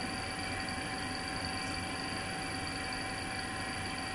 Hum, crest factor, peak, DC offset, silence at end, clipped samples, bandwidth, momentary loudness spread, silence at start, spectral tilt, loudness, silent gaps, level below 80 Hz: none; 14 dB; -24 dBFS; under 0.1%; 0 s; under 0.1%; 11.5 kHz; 1 LU; 0 s; -3 dB/octave; -37 LUFS; none; -54 dBFS